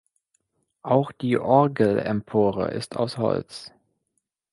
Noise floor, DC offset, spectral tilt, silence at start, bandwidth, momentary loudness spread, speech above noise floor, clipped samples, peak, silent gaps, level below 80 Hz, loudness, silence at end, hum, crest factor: -78 dBFS; under 0.1%; -7.5 dB/octave; 0.85 s; 11.5 kHz; 10 LU; 55 dB; under 0.1%; -4 dBFS; none; -58 dBFS; -23 LUFS; 0.85 s; none; 20 dB